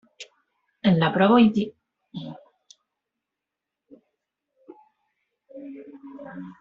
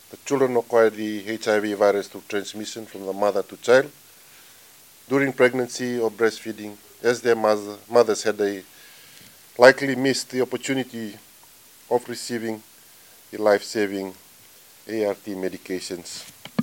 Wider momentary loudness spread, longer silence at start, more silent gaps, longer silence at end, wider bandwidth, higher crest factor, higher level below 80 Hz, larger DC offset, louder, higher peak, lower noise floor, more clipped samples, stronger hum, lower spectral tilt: first, 26 LU vs 15 LU; about the same, 0.2 s vs 0.1 s; neither; about the same, 0.1 s vs 0 s; second, 7.4 kHz vs 17 kHz; about the same, 22 dB vs 24 dB; first, -66 dBFS vs -74 dBFS; neither; first, -20 LUFS vs -23 LUFS; second, -6 dBFS vs 0 dBFS; first, -86 dBFS vs -50 dBFS; neither; neither; first, -5.5 dB/octave vs -4 dB/octave